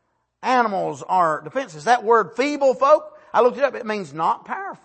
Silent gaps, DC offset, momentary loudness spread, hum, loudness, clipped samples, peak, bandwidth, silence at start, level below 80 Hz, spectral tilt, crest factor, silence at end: none; under 0.1%; 10 LU; none; -20 LUFS; under 0.1%; -4 dBFS; 8.8 kHz; 0.45 s; -72 dBFS; -4.5 dB/octave; 18 dB; 0.1 s